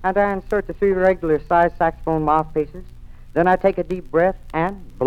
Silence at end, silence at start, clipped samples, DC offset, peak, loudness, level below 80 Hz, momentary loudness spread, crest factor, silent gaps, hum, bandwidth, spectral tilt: 0 s; 0 s; under 0.1%; 0.1%; -4 dBFS; -20 LUFS; -38 dBFS; 8 LU; 16 dB; none; 60 Hz at -45 dBFS; 10.5 kHz; -8.5 dB/octave